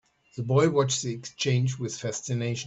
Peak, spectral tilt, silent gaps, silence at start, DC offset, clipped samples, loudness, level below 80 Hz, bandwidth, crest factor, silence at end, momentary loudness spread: -10 dBFS; -5 dB/octave; none; 0.35 s; under 0.1%; under 0.1%; -27 LUFS; -62 dBFS; 8.2 kHz; 18 dB; 0 s; 11 LU